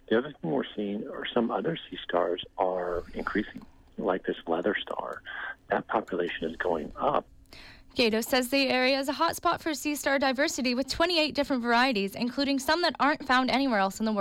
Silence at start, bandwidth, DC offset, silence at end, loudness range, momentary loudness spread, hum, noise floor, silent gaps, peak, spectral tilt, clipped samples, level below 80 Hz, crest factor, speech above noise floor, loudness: 0.1 s; 17 kHz; under 0.1%; 0 s; 6 LU; 10 LU; none; -50 dBFS; none; -14 dBFS; -3.5 dB/octave; under 0.1%; -56 dBFS; 16 dB; 22 dB; -28 LUFS